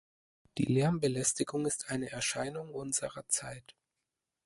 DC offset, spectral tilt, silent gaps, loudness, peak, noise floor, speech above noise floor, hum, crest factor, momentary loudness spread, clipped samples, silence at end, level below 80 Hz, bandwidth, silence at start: under 0.1%; -4 dB/octave; none; -33 LUFS; -14 dBFS; -88 dBFS; 54 dB; none; 20 dB; 11 LU; under 0.1%; 0.75 s; -64 dBFS; 12 kHz; 0.55 s